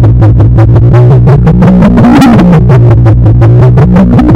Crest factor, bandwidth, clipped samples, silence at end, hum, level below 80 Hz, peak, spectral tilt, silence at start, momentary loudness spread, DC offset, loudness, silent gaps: 2 dB; 7.6 kHz; 30%; 0 s; none; -12 dBFS; 0 dBFS; -9.5 dB/octave; 0 s; 2 LU; 3%; -3 LUFS; none